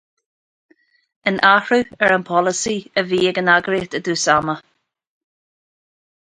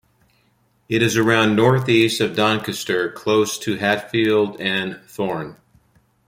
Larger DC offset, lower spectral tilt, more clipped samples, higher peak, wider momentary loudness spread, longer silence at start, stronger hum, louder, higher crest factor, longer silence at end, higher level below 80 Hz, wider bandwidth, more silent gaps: neither; second, -3.5 dB/octave vs -5 dB/octave; neither; about the same, 0 dBFS vs -2 dBFS; about the same, 9 LU vs 10 LU; first, 1.25 s vs 0.9 s; neither; about the same, -17 LUFS vs -19 LUFS; about the same, 20 dB vs 18 dB; first, 1.7 s vs 0.75 s; about the same, -56 dBFS vs -58 dBFS; second, 10.5 kHz vs 16.5 kHz; neither